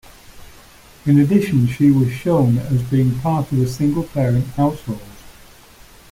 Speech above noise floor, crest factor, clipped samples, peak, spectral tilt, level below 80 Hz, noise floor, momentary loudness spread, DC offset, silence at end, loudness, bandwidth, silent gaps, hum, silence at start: 28 dB; 16 dB; under 0.1%; -2 dBFS; -8.5 dB/octave; -44 dBFS; -44 dBFS; 6 LU; under 0.1%; 0.8 s; -17 LUFS; 16 kHz; none; none; 0.35 s